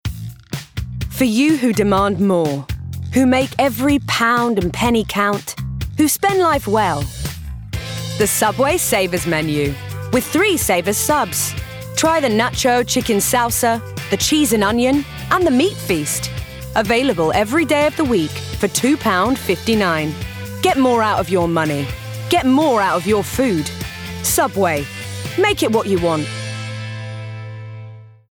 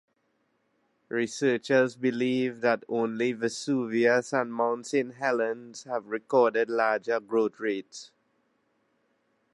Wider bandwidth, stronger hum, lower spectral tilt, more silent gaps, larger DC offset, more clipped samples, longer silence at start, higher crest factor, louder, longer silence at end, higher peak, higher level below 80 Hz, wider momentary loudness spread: first, over 20 kHz vs 11.5 kHz; neither; about the same, -4 dB/octave vs -5 dB/octave; neither; neither; neither; second, 0.05 s vs 1.1 s; about the same, 16 dB vs 18 dB; first, -17 LUFS vs -27 LUFS; second, 0.2 s vs 1.45 s; first, -2 dBFS vs -10 dBFS; first, -38 dBFS vs -82 dBFS; first, 13 LU vs 9 LU